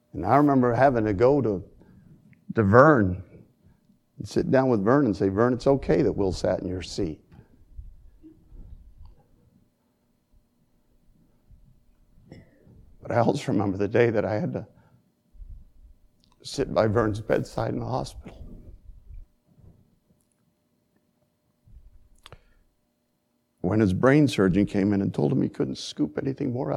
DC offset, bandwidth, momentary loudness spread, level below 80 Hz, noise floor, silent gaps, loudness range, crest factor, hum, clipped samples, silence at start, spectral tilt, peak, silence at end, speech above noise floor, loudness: under 0.1%; 12 kHz; 13 LU; -50 dBFS; -72 dBFS; none; 11 LU; 26 dB; none; under 0.1%; 0.15 s; -7.5 dB/octave; 0 dBFS; 0 s; 50 dB; -23 LUFS